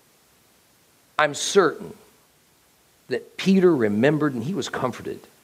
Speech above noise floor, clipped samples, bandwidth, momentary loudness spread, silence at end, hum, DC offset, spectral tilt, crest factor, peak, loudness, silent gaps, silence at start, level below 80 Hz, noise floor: 38 dB; under 0.1%; 15.5 kHz; 16 LU; 0.25 s; none; under 0.1%; -5 dB/octave; 20 dB; -4 dBFS; -22 LUFS; none; 1.2 s; -68 dBFS; -59 dBFS